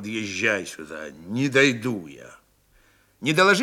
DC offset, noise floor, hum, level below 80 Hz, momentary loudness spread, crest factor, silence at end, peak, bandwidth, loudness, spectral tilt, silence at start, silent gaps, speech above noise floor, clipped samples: under 0.1%; -60 dBFS; none; -66 dBFS; 18 LU; 20 dB; 0 s; -4 dBFS; 16 kHz; -22 LUFS; -4 dB/octave; 0 s; none; 37 dB; under 0.1%